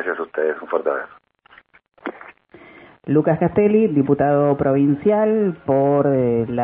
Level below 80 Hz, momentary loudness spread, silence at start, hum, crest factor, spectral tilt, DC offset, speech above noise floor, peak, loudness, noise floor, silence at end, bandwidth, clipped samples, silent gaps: -54 dBFS; 17 LU; 0 s; none; 16 dB; -13 dB/octave; under 0.1%; 34 dB; -4 dBFS; -18 LUFS; -52 dBFS; 0 s; 3.8 kHz; under 0.1%; none